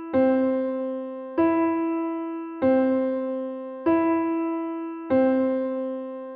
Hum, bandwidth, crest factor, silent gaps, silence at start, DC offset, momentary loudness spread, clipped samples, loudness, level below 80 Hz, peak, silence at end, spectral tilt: none; 4.6 kHz; 14 dB; none; 0 s; under 0.1%; 10 LU; under 0.1%; -25 LUFS; -66 dBFS; -10 dBFS; 0 s; -6 dB/octave